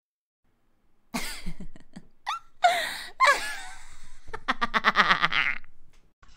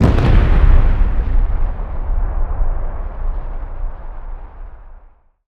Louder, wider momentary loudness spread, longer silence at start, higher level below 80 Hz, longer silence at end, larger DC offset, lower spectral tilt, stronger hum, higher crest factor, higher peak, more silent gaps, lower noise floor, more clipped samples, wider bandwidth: second, -25 LUFS vs -19 LUFS; about the same, 19 LU vs 21 LU; first, 1.15 s vs 0 s; second, -44 dBFS vs -16 dBFS; second, 0 s vs 0.5 s; neither; second, -2 dB/octave vs -8.5 dB/octave; neither; first, 28 dB vs 14 dB; about the same, 0 dBFS vs 0 dBFS; first, 6.13-6.22 s vs none; first, -63 dBFS vs -45 dBFS; neither; first, 16 kHz vs 4.8 kHz